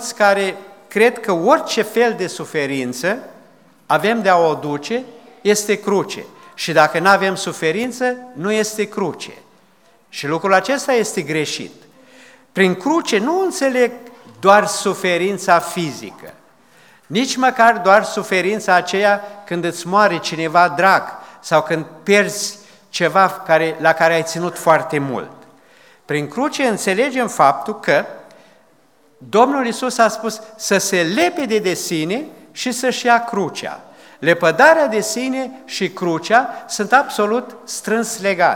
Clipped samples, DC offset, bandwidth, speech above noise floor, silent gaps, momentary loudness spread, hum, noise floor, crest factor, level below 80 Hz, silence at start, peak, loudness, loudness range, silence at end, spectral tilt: under 0.1%; 0.1%; 19 kHz; 38 dB; none; 12 LU; none; -55 dBFS; 18 dB; -70 dBFS; 0 s; 0 dBFS; -17 LUFS; 3 LU; 0 s; -3.5 dB/octave